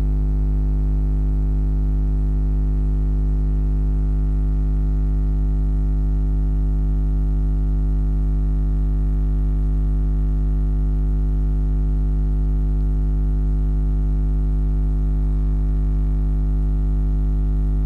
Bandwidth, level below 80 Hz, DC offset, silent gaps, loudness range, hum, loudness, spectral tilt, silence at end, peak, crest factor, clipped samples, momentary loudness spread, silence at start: 1.9 kHz; -18 dBFS; under 0.1%; none; 0 LU; 50 Hz at -20 dBFS; -22 LUFS; -11 dB/octave; 0 s; -16 dBFS; 2 dB; under 0.1%; 0 LU; 0 s